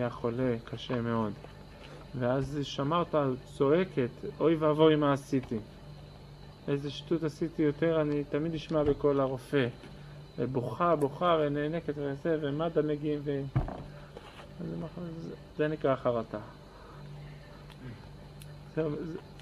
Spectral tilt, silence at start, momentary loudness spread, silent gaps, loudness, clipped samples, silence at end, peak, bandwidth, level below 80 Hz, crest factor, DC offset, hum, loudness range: -7.5 dB/octave; 0 s; 21 LU; none; -31 LUFS; under 0.1%; 0 s; -12 dBFS; 12.5 kHz; -52 dBFS; 20 dB; under 0.1%; none; 7 LU